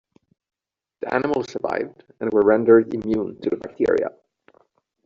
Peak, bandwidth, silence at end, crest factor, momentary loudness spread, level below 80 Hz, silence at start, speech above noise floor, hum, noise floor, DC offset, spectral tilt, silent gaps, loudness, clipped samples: -4 dBFS; 7.2 kHz; 0.95 s; 18 dB; 13 LU; -58 dBFS; 1 s; 45 dB; none; -65 dBFS; under 0.1%; -6 dB/octave; none; -21 LUFS; under 0.1%